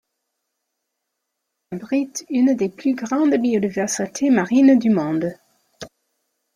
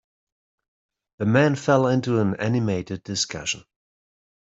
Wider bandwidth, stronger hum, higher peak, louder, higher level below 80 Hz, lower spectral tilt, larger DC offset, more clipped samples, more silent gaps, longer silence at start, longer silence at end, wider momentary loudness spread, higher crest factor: first, 14 kHz vs 8.2 kHz; neither; about the same, -4 dBFS vs -4 dBFS; first, -19 LUFS vs -23 LUFS; about the same, -64 dBFS vs -60 dBFS; about the same, -5.5 dB/octave vs -5.5 dB/octave; neither; neither; neither; first, 1.7 s vs 1.2 s; about the same, 0.7 s vs 0.8 s; first, 20 LU vs 9 LU; about the same, 16 dB vs 20 dB